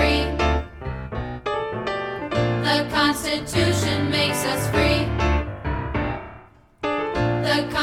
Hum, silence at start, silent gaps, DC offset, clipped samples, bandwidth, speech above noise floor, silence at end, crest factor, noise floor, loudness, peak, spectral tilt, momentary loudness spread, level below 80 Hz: none; 0 s; none; under 0.1%; under 0.1%; 16.5 kHz; 26 dB; 0 s; 18 dB; -47 dBFS; -23 LUFS; -6 dBFS; -5 dB/octave; 10 LU; -32 dBFS